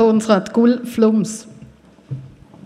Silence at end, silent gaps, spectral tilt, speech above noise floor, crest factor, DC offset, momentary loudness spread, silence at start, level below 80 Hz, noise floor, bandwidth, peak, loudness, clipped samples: 0.4 s; none; -6 dB/octave; 28 dB; 16 dB; under 0.1%; 19 LU; 0 s; -56 dBFS; -44 dBFS; 13 kHz; -2 dBFS; -16 LUFS; under 0.1%